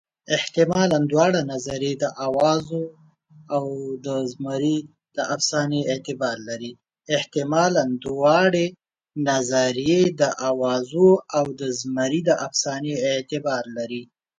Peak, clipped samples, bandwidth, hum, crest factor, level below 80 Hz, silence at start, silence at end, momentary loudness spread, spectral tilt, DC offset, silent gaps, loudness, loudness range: -4 dBFS; under 0.1%; 9.6 kHz; none; 18 dB; -62 dBFS; 0.3 s; 0.35 s; 11 LU; -4.5 dB/octave; under 0.1%; none; -22 LUFS; 5 LU